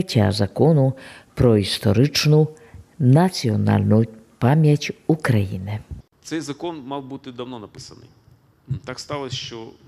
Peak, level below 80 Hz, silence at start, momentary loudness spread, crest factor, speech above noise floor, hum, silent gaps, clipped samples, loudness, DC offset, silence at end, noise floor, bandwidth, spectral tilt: -4 dBFS; -48 dBFS; 0 s; 18 LU; 18 dB; 35 dB; none; none; under 0.1%; -20 LUFS; under 0.1%; 0.2 s; -54 dBFS; 14.5 kHz; -6.5 dB/octave